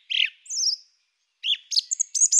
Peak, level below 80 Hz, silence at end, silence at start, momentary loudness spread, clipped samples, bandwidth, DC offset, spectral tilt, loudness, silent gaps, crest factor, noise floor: -6 dBFS; under -90 dBFS; 0 s; 0.1 s; 6 LU; under 0.1%; 16 kHz; under 0.1%; 14.5 dB/octave; -23 LUFS; none; 18 dB; -71 dBFS